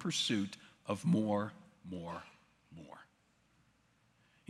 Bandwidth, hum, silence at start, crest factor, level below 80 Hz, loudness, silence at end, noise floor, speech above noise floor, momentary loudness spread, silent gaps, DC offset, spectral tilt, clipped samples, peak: 13 kHz; none; 0 s; 20 dB; -80 dBFS; -37 LUFS; 1.45 s; -73 dBFS; 36 dB; 23 LU; none; under 0.1%; -5 dB/octave; under 0.1%; -20 dBFS